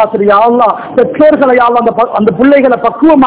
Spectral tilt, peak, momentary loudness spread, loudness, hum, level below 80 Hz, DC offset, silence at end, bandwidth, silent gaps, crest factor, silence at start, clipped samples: -10 dB/octave; 0 dBFS; 4 LU; -8 LUFS; none; -44 dBFS; under 0.1%; 0 s; 4 kHz; none; 6 dB; 0 s; 6%